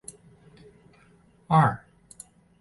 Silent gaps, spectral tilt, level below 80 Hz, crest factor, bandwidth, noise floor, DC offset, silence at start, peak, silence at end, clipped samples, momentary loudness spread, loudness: none; -7 dB/octave; -60 dBFS; 22 dB; 11.5 kHz; -59 dBFS; under 0.1%; 1.5 s; -8 dBFS; 0.85 s; under 0.1%; 25 LU; -23 LUFS